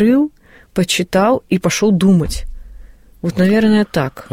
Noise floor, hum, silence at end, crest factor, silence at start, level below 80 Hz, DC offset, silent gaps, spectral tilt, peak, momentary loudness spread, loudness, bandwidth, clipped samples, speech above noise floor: -38 dBFS; none; 0.1 s; 12 dB; 0 s; -34 dBFS; under 0.1%; none; -5.5 dB/octave; -4 dBFS; 11 LU; -15 LUFS; 16 kHz; under 0.1%; 24 dB